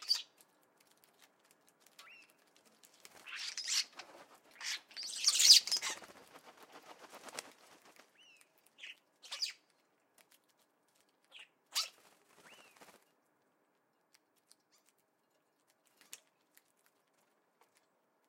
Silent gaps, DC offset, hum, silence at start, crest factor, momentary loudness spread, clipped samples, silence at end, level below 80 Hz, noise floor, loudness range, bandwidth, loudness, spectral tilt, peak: none; under 0.1%; none; 0 s; 32 dB; 32 LU; under 0.1%; 6.4 s; under -90 dBFS; -78 dBFS; 18 LU; 16.5 kHz; -31 LUFS; 4 dB/octave; -10 dBFS